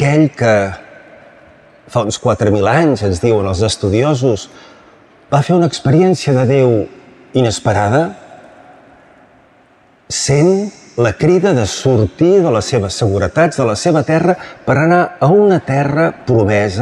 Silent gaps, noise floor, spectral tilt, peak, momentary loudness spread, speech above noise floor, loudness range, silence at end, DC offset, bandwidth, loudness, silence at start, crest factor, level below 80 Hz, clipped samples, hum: none; -49 dBFS; -6 dB/octave; -2 dBFS; 7 LU; 37 dB; 5 LU; 0 s; under 0.1%; 11.5 kHz; -13 LUFS; 0 s; 12 dB; -46 dBFS; under 0.1%; none